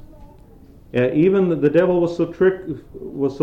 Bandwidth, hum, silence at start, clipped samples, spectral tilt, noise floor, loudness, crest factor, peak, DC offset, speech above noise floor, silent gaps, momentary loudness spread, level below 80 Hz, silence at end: 7.2 kHz; none; 0 s; under 0.1%; -9 dB/octave; -45 dBFS; -18 LUFS; 14 dB; -6 dBFS; under 0.1%; 27 dB; none; 15 LU; -46 dBFS; 0 s